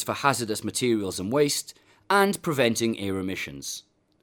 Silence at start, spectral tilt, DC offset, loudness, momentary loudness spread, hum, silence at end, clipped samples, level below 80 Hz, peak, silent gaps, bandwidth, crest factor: 0 s; -4 dB/octave; under 0.1%; -26 LUFS; 11 LU; none; 0.4 s; under 0.1%; -62 dBFS; -4 dBFS; none; 19.5 kHz; 22 dB